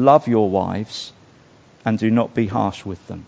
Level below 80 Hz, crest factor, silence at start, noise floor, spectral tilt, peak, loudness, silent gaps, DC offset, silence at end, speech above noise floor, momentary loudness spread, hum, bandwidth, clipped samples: -48 dBFS; 20 dB; 0 s; -50 dBFS; -7.5 dB/octave; 0 dBFS; -20 LUFS; none; under 0.1%; 0.05 s; 31 dB; 16 LU; none; 8 kHz; under 0.1%